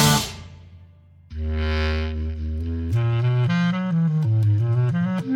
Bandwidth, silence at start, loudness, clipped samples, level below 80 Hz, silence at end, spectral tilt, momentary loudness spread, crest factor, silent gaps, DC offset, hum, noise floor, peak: 18 kHz; 0 s; -22 LUFS; under 0.1%; -32 dBFS; 0 s; -5.5 dB/octave; 10 LU; 18 dB; none; under 0.1%; none; -49 dBFS; -4 dBFS